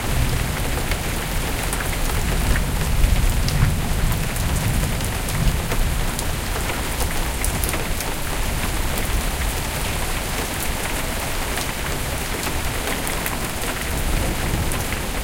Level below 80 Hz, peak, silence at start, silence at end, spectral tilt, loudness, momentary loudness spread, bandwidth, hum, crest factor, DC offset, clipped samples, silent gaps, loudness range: -24 dBFS; -4 dBFS; 0 s; 0 s; -4 dB/octave; -23 LUFS; 3 LU; 17 kHz; none; 18 dB; under 0.1%; under 0.1%; none; 2 LU